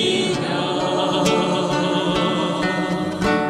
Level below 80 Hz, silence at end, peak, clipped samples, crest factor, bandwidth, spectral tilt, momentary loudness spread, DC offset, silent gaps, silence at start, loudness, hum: -46 dBFS; 0 s; -4 dBFS; under 0.1%; 16 dB; 14.5 kHz; -5 dB/octave; 3 LU; under 0.1%; none; 0 s; -20 LUFS; none